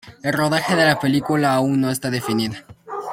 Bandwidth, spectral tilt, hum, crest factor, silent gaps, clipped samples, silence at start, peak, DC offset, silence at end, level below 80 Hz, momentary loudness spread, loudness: 16.5 kHz; -5 dB/octave; none; 18 dB; none; under 0.1%; 0.05 s; -2 dBFS; under 0.1%; 0 s; -56 dBFS; 12 LU; -19 LUFS